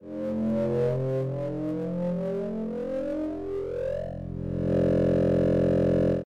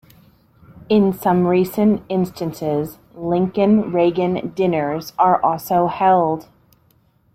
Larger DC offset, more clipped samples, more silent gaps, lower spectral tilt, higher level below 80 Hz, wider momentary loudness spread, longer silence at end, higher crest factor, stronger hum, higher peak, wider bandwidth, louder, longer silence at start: neither; neither; neither; first, -10 dB/octave vs -7.5 dB/octave; first, -46 dBFS vs -54 dBFS; about the same, 9 LU vs 8 LU; second, 0 s vs 0.95 s; second, 10 dB vs 16 dB; neither; second, -16 dBFS vs -4 dBFS; second, 7.8 kHz vs 16.5 kHz; second, -27 LUFS vs -18 LUFS; second, 0 s vs 0.75 s